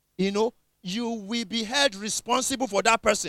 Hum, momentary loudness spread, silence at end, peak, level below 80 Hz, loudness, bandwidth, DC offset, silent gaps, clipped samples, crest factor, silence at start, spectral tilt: none; 9 LU; 0 s; -6 dBFS; -58 dBFS; -25 LUFS; 16.5 kHz; under 0.1%; none; under 0.1%; 20 dB; 0.2 s; -2.5 dB/octave